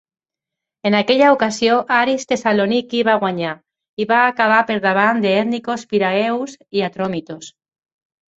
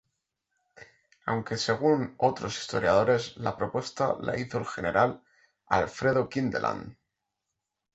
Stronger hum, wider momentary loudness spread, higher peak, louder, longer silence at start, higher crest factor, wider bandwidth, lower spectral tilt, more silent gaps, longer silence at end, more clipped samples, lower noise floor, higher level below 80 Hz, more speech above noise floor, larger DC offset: neither; about the same, 11 LU vs 9 LU; first, -2 dBFS vs -8 dBFS; first, -17 LUFS vs -28 LUFS; about the same, 0.85 s vs 0.8 s; second, 16 dB vs 22 dB; about the same, 8.2 kHz vs 8.2 kHz; about the same, -4.5 dB/octave vs -5.5 dB/octave; first, 3.89-3.97 s vs none; about the same, 0.9 s vs 1 s; neither; about the same, -85 dBFS vs -85 dBFS; about the same, -62 dBFS vs -58 dBFS; first, 68 dB vs 57 dB; neither